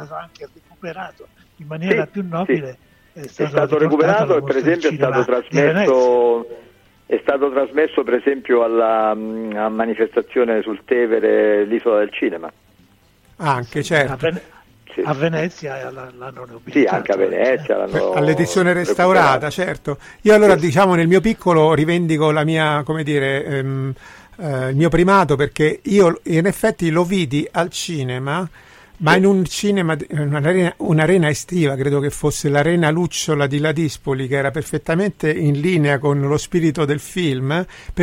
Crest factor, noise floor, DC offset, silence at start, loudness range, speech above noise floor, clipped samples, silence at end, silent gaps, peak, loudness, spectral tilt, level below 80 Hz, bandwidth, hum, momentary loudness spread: 14 dB; -53 dBFS; under 0.1%; 0 s; 7 LU; 36 dB; under 0.1%; 0 s; none; -2 dBFS; -17 LUFS; -6 dB/octave; -46 dBFS; 16 kHz; none; 11 LU